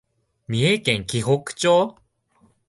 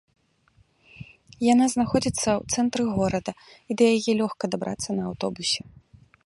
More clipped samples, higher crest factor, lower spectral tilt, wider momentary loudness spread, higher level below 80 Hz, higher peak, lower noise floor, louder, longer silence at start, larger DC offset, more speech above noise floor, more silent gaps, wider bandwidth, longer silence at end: neither; about the same, 18 dB vs 20 dB; about the same, -4.5 dB/octave vs -4.5 dB/octave; second, 7 LU vs 14 LU; about the same, -54 dBFS vs -52 dBFS; about the same, -4 dBFS vs -6 dBFS; about the same, -61 dBFS vs -62 dBFS; first, -21 LUFS vs -24 LUFS; second, 0.5 s vs 1 s; neither; about the same, 41 dB vs 39 dB; neither; about the same, 11.5 kHz vs 11.5 kHz; first, 0.8 s vs 0.55 s